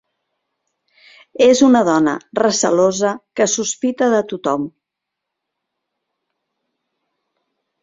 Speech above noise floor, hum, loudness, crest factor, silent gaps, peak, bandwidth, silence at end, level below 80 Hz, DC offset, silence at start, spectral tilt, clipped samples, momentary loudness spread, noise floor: 66 dB; none; -16 LUFS; 18 dB; none; -2 dBFS; 7.8 kHz; 3.15 s; -62 dBFS; under 0.1%; 1.4 s; -3.5 dB/octave; under 0.1%; 9 LU; -81 dBFS